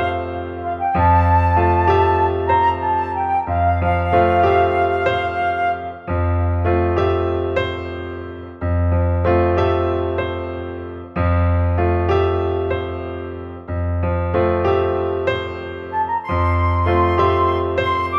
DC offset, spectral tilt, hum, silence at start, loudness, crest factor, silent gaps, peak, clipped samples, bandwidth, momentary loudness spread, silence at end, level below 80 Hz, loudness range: under 0.1%; -9 dB/octave; none; 0 s; -18 LUFS; 16 dB; none; -2 dBFS; under 0.1%; 5.6 kHz; 12 LU; 0 s; -38 dBFS; 4 LU